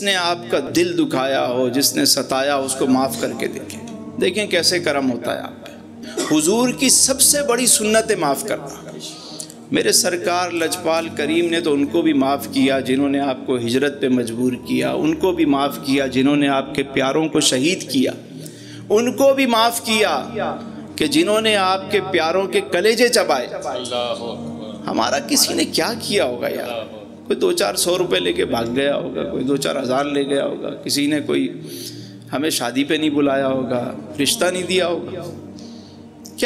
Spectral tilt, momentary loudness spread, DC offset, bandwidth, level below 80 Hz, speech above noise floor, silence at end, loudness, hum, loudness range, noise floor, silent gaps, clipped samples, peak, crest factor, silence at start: -3 dB/octave; 16 LU; under 0.1%; 16 kHz; -56 dBFS; 20 dB; 0 s; -18 LUFS; none; 5 LU; -39 dBFS; none; under 0.1%; 0 dBFS; 18 dB; 0 s